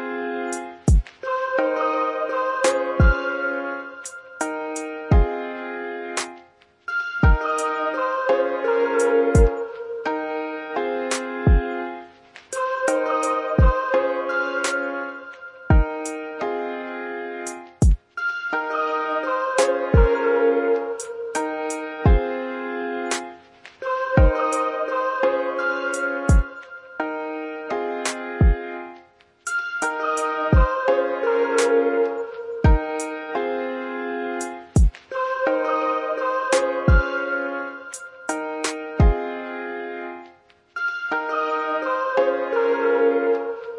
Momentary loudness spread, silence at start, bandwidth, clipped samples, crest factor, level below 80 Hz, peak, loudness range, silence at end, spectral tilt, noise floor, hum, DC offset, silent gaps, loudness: 11 LU; 0 s; 11.5 kHz; under 0.1%; 18 dB; -28 dBFS; -4 dBFS; 5 LU; 0 s; -6 dB/octave; -52 dBFS; none; under 0.1%; none; -23 LUFS